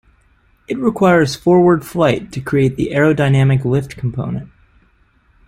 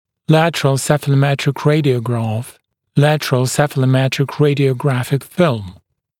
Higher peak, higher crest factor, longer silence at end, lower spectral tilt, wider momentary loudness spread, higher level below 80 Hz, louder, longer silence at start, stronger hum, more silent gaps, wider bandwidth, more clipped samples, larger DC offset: about the same, -2 dBFS vs 0 dBFS; about the same, 14 dB vs 16 dB; first, 1 s vs 0.5 s; first, -7.5 dB/octave vs -6 dB/octave; first, 11 LU vs 7 LU; first, -44 dBFS vs -54 dBFS; about the same, -15 LUFS vs -16 LUFS; first, 0.7 s vs 0.3 s; neither; neither; about the same, 15 kHz vs 16 kHz; neither; neither